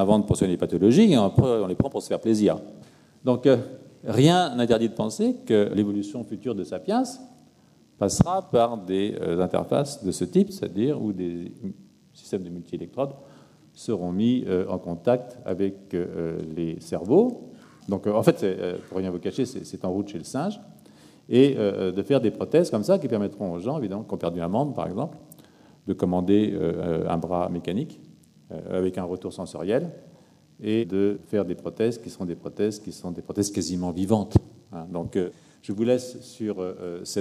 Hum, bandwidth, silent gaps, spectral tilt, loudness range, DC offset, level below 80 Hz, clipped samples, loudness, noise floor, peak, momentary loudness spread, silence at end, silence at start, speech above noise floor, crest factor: none; 14.5 kHz; none; -6.5 dB/octave; 6 LU; under 0.1%; -52 dBFS; under 0.1%; -25 LUFS; -57 dBFS; -6 dBFS; 13 LU; 0 s; 0 s; 33 dB; 20 dB